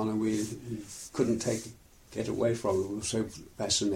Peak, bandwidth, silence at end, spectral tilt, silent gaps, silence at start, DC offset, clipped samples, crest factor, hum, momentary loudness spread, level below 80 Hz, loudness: -14 dBFS; 16 kHz; 0 s; -4.5 dB/octave; none; 0 s; under 0.1%; under 0.1%; 18 dB; none; 11 LU; -58 dBFS; -32 LUFS